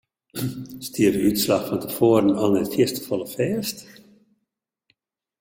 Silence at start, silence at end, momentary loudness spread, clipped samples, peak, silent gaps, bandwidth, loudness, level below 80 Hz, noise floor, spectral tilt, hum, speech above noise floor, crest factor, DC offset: 0.35 s; 1.5 s; 13 LU; under 0.1%; -4 dBFS; none; 17 kHz; -22 LUFS; -58 dBFS; -81 dBFS; -5.5 dB/octave; none; 59 dB; 18 dB; under 0.1%